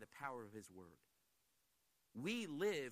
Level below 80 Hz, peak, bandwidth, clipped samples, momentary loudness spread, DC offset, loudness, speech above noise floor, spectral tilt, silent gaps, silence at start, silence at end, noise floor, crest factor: -88 dBFS; -30 dBFS; 15 kHz; under 0.1%; 19 LU; under 0.1%; -46 LUFS; 37 dB; -4.5 dB/octave; none; 0 s; 0 s; -83 dBFS; 18 dB